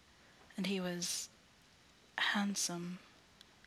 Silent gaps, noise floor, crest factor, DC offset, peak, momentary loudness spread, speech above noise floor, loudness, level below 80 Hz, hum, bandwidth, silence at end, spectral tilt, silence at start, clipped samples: none; -65 dBFS; 20 dB; under 0.1%; -22 dBFS; 15 LU; 27 dB; -38 LUFS; -76 dBFS; none; 15.5 kHz; 0.55 s; -2.5 dB/octave; 0.4 s; under 0.1%